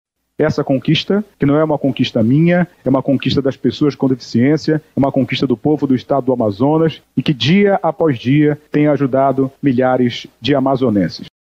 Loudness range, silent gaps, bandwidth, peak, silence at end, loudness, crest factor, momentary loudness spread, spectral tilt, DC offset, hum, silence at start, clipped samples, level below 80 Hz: 1 LU; none; 7.6 kHz; -2 dBFS; 0.3 s; -15 LUFS; 12 dB; 5 LU; -7.5 dB/octave; under 0.1%; none; 0.4 s; under 0.1%; -50 dBFS